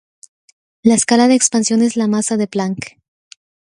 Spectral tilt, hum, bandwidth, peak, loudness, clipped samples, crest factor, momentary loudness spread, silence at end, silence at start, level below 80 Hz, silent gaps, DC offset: -4 dB/octave; none; 11.5 kHz; 0 dBFS; -14 LUFS; under 0.1%; 16 dB; 11 LU; 0.9 s; 0.85 s; -58 dBFS; none; under 0.1%